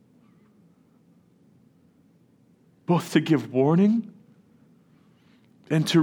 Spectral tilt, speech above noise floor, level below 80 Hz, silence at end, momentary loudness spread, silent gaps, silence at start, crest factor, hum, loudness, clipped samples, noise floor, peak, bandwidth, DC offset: -6.5 dB/octave; 39 dB; -76 dBFS; 0 s; 10 LU; none; 2.9 s; 20 dB; none; -23 LUFS; under 0.1%; -60 dBFS; -6 dBFS; 18.5 kHz; under 0.1%